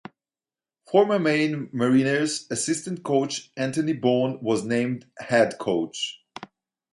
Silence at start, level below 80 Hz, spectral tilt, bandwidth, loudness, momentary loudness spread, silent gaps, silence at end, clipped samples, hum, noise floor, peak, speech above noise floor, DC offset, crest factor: 0.9 s; -68 dBFS; -4.5 dB/octave; 11.5 kHz; -24 LUFS; 10 LU; none; 0.5 s; under 0.1%; none; under -90 dBFS; -6 dBFS; over 67 dB; under 0.1%; 18 dB